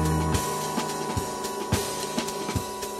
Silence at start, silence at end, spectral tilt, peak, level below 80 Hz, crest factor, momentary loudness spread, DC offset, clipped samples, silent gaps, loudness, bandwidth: 0 s; 0 s; -4.5 dB/octave; -10 dBFS; -40 dBFS; 18 dB; 5 LU; under 0.1%; under 0.1%; none; -28 LUFS; 16 kHz